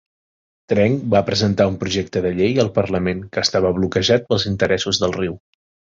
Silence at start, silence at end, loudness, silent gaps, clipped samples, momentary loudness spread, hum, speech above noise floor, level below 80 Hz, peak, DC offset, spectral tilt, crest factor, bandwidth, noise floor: 0.7 s; 0.6 s; -19 LUFS; none; under 0.1%; 6 LU; none; over 72 dB; -42 dBFS; -2 dBFS; under 0.1%; -5 dB/octave; 16 dB; 7.8 kHz; under -90 dBFS